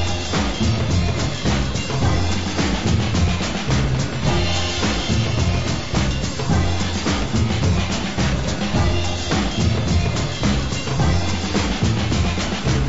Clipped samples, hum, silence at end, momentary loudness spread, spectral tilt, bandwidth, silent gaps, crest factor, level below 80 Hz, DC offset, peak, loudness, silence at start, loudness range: under 0.1%; none; 0 s; 2 LU; -5 dB/octave; 8 kHz; none; 12 dB; -28 dBFS; 3%; -8 dBFS; -20 LUFS; 0 s; 1 LU